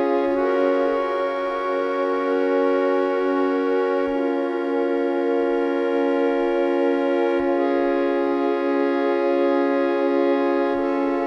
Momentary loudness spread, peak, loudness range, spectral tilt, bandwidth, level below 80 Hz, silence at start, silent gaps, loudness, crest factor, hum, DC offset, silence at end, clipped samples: 3 LU; -8 dBFS; 1 LU; -5.5 dB/octave; 6.4 kHz; -56 dBFS; 0 s; none; -21 LUFS; 12 dB; none; under 0.1%; 0 s; under 0.1%